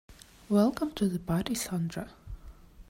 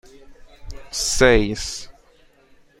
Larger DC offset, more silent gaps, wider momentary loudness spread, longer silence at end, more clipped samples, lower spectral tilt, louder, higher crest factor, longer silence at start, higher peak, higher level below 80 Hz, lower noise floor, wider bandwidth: neither; neither; first, 22 LU vs 18 LU; second, 0.05 s vs 0.9 s; neither; first, -6 dB/octave vs -3.5 dB/octave; second, -30 LUFS vs -19 LUFS; about the same, 18 dB vs 22 dB; second, 0.1 s vs 0.3 s; second, -14 dBFS vs -2 dBFS; second, -52 dBFS vs -32 dBFS; second, -50 dBFS vs -54 dBFS; about the same, 16 kHz vs 16 kHz